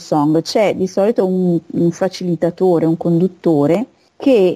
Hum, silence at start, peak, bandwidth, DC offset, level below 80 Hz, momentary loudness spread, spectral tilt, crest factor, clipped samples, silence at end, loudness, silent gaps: none; 0 s; -4 dBFS; 13.5 kHz; under 0.1%; -58 dBFS; 5 LU; -7.5 dB/octave; 12 dB; under 0.1%; 0 s; -16 LUFS; none